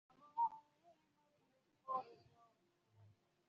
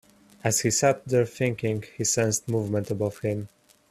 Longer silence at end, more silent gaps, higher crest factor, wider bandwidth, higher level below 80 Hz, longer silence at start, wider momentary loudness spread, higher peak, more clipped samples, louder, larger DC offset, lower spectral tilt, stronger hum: about the same, 0.45 s vs 0.45 s; neither; about the same, 20 dB vs 18 dB; second, 7 kHz vs 15 kHz; second, under -90 dBFS vs -60 dBFS; second, 0.25 s vs 0.45 s; first, 19 LU vs 8 LU; second, -30 dBFS vs -8 dBFS; neither; second, -45 LUFS vs -26 LUFS; neither; about the same, -4.5 dB/octave vs -4.5 dB/octave; neither